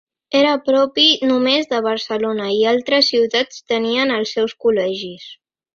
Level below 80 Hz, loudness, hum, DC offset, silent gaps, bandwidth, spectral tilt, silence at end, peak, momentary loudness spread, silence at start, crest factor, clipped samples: -62 dBFS; -16 LUFS; none; under 0.1%; none; 7.2 kHz; -3.5 dB/octave; 0.4 s; 0 dBFS; 8 LU; 0.3 s; 16 dB; under 0.1%